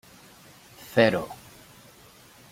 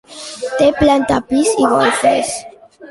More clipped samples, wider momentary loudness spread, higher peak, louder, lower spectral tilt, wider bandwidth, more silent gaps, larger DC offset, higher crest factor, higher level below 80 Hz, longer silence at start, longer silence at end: neither; first, 25 LU vs 12 LU; about the same, -4 dBFS vs -2 dBFS; second, -24 LUFS vs -14 LUFS; first, -5.5 dB/octave vs -4 dB/octave; first, 16.5 kHz vs 11.5 kHz; neither; neither; first, 26 dB vs 14 dB; second, -62 dBFS vs -40 dBFS; first, 0.8 s vs 0.1 s; first, 1.15 s vs 0 s